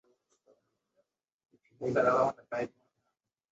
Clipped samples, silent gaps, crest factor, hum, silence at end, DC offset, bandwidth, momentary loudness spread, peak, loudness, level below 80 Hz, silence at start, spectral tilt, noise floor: under 0.1%; none; 22 dB; none; 0.85 s; under 0.1%; 7.8 kHz; 12 LU; -14 dBFS; -31 LUFS; -74 dBFS; 1.8 s; -6.5 dB/octave; -84 dBFS